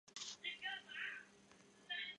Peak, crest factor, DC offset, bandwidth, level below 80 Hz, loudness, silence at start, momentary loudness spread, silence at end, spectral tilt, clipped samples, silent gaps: -32 dBFS; 18 dB; under 0.1%; 11 kHz; under -90 dBFS; -47 LUFS; 0.05 s; 19 LU; 0 s; 0.5 dB/octave; under 0.1%; none